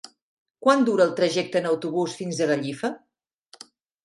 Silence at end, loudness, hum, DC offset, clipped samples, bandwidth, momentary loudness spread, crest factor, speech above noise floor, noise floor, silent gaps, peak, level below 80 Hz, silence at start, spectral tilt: 1.05 s; -23 LUFS; none; under 0.1%; under 0.1%; 11.5 kHz; 10 LU; 20 dB; 36 dB; -59 dBFS; none; -4 dBFS; -74 dBFS; 0.6 s; -5 dB/octave